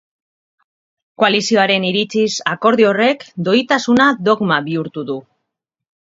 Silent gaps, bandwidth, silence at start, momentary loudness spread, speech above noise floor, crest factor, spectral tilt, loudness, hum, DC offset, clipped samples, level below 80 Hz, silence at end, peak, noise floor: none; 7.8 kHz; 1.2 s; 10 LU; 63 dB; 16 dB; -4.5 dB/octave; -15 LUFS; none; under 0.1%; under 0.1%; -62 dBFS; 0.9 s; 0 dBFS; -78 dBFS